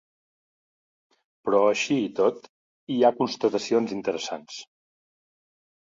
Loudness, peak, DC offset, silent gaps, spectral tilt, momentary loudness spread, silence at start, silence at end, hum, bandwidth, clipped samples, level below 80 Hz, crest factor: -25 LUFS; -6 dBFS; under 0.1%; 2.49-2.87 s; -4.5 dB/octave; 14 LU; 1.45 s; 1.2 s; none; 7.8 kHz; under 0.1%; -72 dBFS; 20 dB